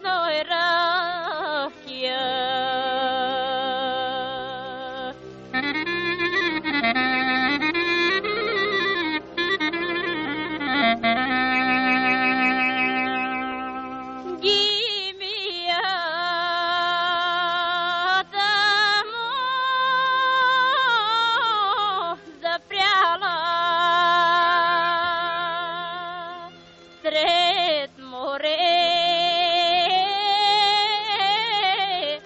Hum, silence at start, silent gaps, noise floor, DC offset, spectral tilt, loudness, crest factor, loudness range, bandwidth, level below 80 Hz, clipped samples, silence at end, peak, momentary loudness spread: none; 0 s; none; -47 dBFS; under 0.1%; 1 dB/octave; -21 LUFS; 14 dB; 5 LU; 8 kHz; -60 dBFS; under 0.1%; 0 s; -8 dBFS; 10 LU